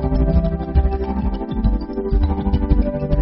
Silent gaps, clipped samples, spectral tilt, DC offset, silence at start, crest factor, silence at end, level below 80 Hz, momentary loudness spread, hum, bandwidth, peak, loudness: none; under 0.1%; -9 dB/octave; under 0.1%; 0 s; 14 dB; 0 s; -20 dBFS; 5 LU; none; 5.6 kHz; -4 dBFS; -20 LUFS